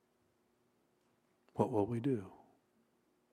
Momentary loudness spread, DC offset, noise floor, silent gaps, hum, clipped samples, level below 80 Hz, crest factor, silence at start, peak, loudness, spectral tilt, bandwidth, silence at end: 14 LU; under 0.1%; -77 dBFS; none; none; under 0.1%; -76 dBFS; 24 dB; 1.55 s; -18 dBFS; -37 LUFS; -9 dB/octave; 13 kHz; 0.95 s